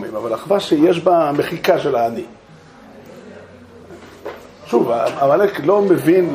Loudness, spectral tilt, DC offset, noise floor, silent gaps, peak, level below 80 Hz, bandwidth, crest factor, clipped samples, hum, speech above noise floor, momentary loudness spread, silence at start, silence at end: -16 LUFS; -6.5 dB/octave; under 0.1%; -43 dBFS; none; -2 dBFS; -58 dBFS; 15.5 kHz; 16 dB; under 0.1%; none; 27 dB; 20 LU; 0 s; 0 s